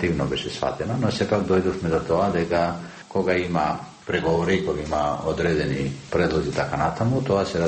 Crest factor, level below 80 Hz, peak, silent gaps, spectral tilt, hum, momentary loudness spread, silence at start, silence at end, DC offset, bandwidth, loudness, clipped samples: 16 dB; -44 dBFS; -8 dBFS; none; -6.5 dB/octave; none; 5 LU; 0 s; 0 s; under 0.1%; 8.8 kHz; -24 LUFS; under 0.1%